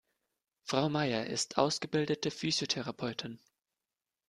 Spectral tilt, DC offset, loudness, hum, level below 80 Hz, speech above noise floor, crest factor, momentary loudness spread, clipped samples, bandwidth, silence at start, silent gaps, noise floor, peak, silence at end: -4 dB/octave; under 0.1%; -33 LUFS; none; -72 dBFS; over 57 dB; 24 dB; 11 LU; under 0.1%; 13 kHz; 0.65 s; none; under -90 dBFS; -12 dBFS; 0.9 s